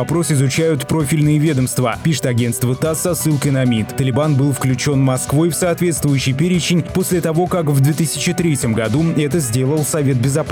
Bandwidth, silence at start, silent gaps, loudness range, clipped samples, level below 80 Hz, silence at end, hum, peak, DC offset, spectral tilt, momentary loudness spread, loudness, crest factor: 19 kHz; 0 s; none; 1 LU; under 0.1%; -44 dBFS; 0 s; none; -6 dBFS; under 0.1%; -5.5 dB/octave; 3 LU; -16 LUFS; 10 dB